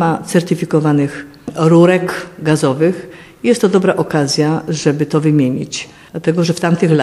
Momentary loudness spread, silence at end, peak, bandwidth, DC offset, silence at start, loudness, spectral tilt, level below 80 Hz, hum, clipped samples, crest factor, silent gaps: 11 LU; 0 s; 0 dBFS; 13 kHz; under 0.1%; 0 s; -14 LUFS; -6 dB/octave; -54 dBFS; none; under 0.1%; 14 dB; none